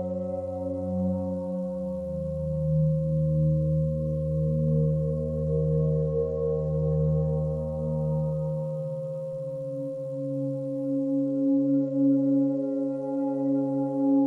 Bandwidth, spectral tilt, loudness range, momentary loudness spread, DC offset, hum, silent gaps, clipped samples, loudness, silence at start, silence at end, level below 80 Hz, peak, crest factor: 1.5 kHz; -12.5 dB/octave; 5 LU; 8 LU; under 0.1%; none; none; under 0.1%; -27 LUFS; 0 s; 0 s; -44 dBFS; -14 dBFS; 12 dB